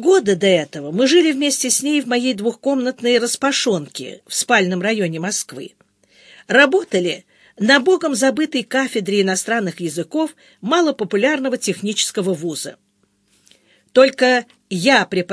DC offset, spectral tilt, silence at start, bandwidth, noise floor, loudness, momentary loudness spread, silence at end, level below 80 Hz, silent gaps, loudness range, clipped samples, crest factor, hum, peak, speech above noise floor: under 0.1%; -3.5 dB/octave; 0 s; 11 kHz; -62 dBFS; -17 LUFS; 11 LU; 0 s; -70 dBFS; none; 3 LU; under 0.1%; 18 dB; none; 0 dBFS; 45 dB